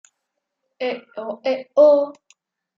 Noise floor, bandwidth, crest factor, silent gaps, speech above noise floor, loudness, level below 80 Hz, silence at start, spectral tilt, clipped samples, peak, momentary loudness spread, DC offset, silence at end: -78 dBFS; 7.4 kHz; 18 dB; none; 60 dB; -19 LUFS; -84 dBFS; 0.8 s; -4.5 dB/octave; under 0.1%; -4 dBFS; 16 LU; under 0.1%; 0.65 s